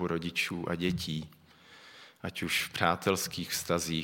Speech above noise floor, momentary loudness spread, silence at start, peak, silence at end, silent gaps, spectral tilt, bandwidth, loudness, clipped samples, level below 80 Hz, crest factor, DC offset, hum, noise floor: 24 dB; 19 LU; 0 s; -8 dBFS; 0 s; none; -3.5 dB/octave; 17 kHz; -32 LUFS; under 0.1%; -64 dBFS; 26 dB; under 0.1%; none; -56 dBFS